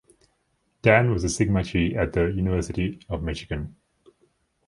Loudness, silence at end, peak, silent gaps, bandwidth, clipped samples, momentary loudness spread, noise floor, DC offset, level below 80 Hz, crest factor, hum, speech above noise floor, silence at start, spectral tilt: -24 LUFS; 1 s; -2 dBFS; none; 11.5 kHz; under 0.1%; 12 LU; -71 dBFS; under 0.1%; -38 dBFS; 22 dB; none; 47 dB; 0.85 s; -6 dB/octave